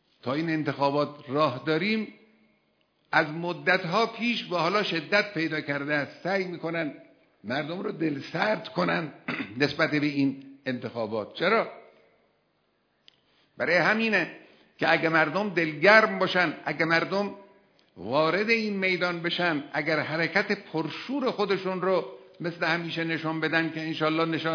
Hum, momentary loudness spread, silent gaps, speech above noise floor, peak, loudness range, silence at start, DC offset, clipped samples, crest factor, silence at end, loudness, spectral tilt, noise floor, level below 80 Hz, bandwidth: none; 9 LU; none; 45 dB; -2 dBFS; 6 LU; 0.25 s; under 0.1%; under 0.1%; 24 dB; 0 s; -26 LUFS; -6 dB/octave; -71 dBFS; -76 dBFS; 5.4 kHz